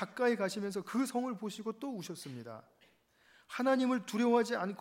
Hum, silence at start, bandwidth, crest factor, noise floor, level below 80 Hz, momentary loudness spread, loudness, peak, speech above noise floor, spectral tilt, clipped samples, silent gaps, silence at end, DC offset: none; 0 s; 16 kHz; 18 dB; -68 dBFS; -86 dBFS; 15 LU; -34 LUFS; -18 dBFS; 33 dB; -5 dB/octave; under 0.1%; none; 0 s; under 0.1%